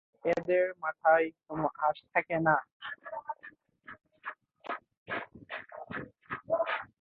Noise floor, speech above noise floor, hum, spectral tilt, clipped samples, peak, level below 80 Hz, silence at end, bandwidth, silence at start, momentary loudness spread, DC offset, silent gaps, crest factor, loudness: -55 dBFS; 25 dB; none; -7.5 dB/octave; under 0.1%; -12 dBFS; -70 dBFS; 0.15 s; 6.8 kHz; 0.25 s; 17 LU; under 0.1%; 2.72-2.80 s, 4.97-5.06 s; 22 dB; -32 LUFS